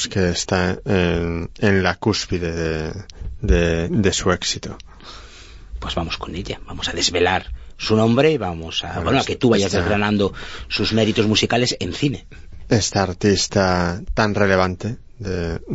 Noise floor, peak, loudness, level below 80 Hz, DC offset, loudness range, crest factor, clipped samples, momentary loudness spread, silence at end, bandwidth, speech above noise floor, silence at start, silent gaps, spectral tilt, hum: -40 dBFS; -2 dBFS; -20 LUFS; -34 dBFS; under 0.1%; 4 LU; 18 dB; under 0.1%; 14 LU; 0 s; 8 kHz; 20 dB; 0 s; none; -4.5 dB/octave; none